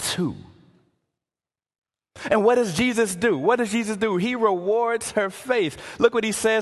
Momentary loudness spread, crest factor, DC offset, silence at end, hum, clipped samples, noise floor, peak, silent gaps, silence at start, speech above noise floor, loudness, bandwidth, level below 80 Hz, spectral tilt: 6 LU; 18 dB; under 0.1%; 0 s; none; under 0.1%; under -90 dBFS; -4 dBFS; 1.78-1.82 s; 0 s; over 68 dB; -22 LUFS; 12.5 kHz; -56 dBFS; -4 dB/octave